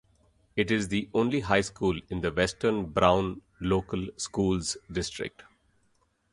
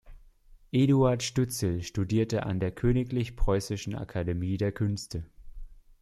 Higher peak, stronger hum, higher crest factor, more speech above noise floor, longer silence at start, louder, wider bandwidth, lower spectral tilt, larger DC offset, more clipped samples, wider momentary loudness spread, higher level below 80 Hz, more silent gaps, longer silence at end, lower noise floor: first, -6 dBFS vs -12 dBFS; neither; first, 22 dB vs 16 dB; first, 42 dB vs 28 dB; first, 0.55 s vs 0.05 s; about the same, -28 LUFS vs -29 LUFS; second, 11.5 kHz vs 13.5 kHz; second, -5 dB/octave vs -6.5 dB/octave; neither; neither; about the same, 11 LU vs 10 LU; second, -48 dBFS vs -40 dBFS; neither; first, 1.05 s vs 0.25 s; first, -70 dBFS vs -55 dBFS